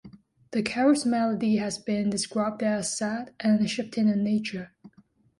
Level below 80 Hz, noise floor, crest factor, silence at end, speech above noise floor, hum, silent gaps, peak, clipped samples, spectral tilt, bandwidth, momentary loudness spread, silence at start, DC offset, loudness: -64 dBFS; -60 dBFS; 18 dB; 0.5 s; 34 dB; none; none; -10 dBFS; under 0.1%; -5 dB/octave; 11.5 kHz; 8 LU; 0.05 s; under 0.1%; -26 LUFS